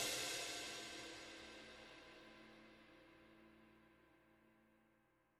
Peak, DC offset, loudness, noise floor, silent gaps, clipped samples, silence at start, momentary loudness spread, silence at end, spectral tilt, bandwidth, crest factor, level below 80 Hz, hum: -30 dBFS; under 0.1%; -49 LUFS; -78 dBFS; none; under 0.1%; 0 s; 23 LU; 0.5 s; -0.5 dB/octave; 18 kHz; 24 dB; -78 dBFS; none